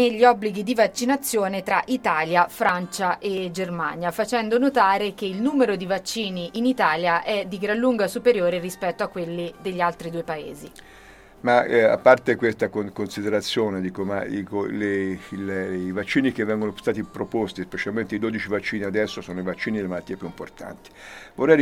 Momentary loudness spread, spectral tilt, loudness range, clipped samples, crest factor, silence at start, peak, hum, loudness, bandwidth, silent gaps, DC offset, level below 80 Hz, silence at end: 12 LU; -5 dB/octave; 5 LU; under 0.1%; 22 dB; 0 s; -2 dBFS; none; -23 LUFS; 17 kHz; none; under 0.1%; -58 dBFS; 0 s